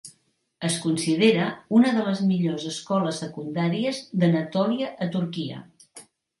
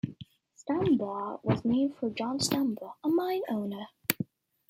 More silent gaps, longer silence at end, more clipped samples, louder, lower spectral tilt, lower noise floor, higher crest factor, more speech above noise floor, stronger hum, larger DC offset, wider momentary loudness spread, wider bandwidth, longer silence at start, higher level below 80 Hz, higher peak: neither; about the same, 0.4 s vs 0.45 s; neither; first, -24 LUFS vs -31 LUFS; about the same, -5.5 dB/octave vs -5 dB/octave; first, -67 dBFS vs -52 dBFS; second, 18 dB vs 28 dB; first, 43 dB vs 22 dB; neither; neither; about the same, 11 LU vs 10 LU; second, 11.5 kHz vs 16.5 kHz; about the same, 0.05 s vs 0.05 s; about the same, -70 dBFS vs -66 dBFS; second, -8 dBFS vs -4 dBFS